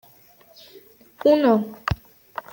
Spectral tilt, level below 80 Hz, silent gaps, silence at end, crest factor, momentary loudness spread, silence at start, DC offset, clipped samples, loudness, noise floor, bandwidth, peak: -7.5 dB/octave; -44 dBFS; none; 0.6 s; 18 dB; 19 LU; 1.25 s; under 0.1%; under 0.1%; -21 LUFS; -53 dBFS; 17 kHz; -6 dBFS